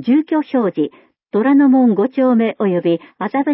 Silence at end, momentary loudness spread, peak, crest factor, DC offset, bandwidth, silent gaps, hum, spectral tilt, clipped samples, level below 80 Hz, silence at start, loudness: 0 s; 10 LU; -4 dBFS; 10 dB; under 0.1%; 5.6 kHz; none; none; -12.5 dB/octave; under 0.1%; -68 dBFS; 0 s; -16 LUFS